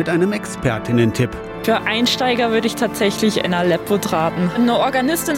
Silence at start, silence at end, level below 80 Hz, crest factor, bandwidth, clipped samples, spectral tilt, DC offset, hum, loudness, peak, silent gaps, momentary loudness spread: 0 s; 0 s; -44 dBFS; 14 dB; 17 kHz; under 0.1%; -5 dB/octave; under 0.1%; none; -18 LUFS; -4 dBFS; none; 5 LU